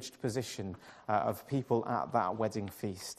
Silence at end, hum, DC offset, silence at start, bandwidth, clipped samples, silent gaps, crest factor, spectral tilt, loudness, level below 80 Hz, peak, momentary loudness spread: 0.05 s; none; under 0.1%; 0 s; 15 kHz; under 0.1%; none; 18 dB; -5.5 dB/octave; -35 LUFS; -70 dBFS; -16 dBFS; 9 LU